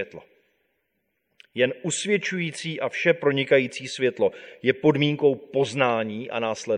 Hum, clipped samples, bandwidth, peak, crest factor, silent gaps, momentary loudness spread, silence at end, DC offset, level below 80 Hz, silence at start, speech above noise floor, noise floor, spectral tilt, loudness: none; under 0.1%; 11 kHz; -4 dBFS; 20 dB; none; 8 LU; 0 s; under 0.1%; -70 dBFS; 0 s; 51 dB; -75 dBFS; -4.5 dB/octave; -24 LUFS